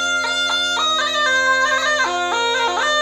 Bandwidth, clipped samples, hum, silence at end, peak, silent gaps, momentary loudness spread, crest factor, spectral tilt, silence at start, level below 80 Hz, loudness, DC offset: 19 kHz; under 0.1%; none; 0 s; -6 dBFS; none; 3 LU; 12 dB; 0 dB/octave; 0 s; -60 dBFS; -17 LUFS; under 0.1%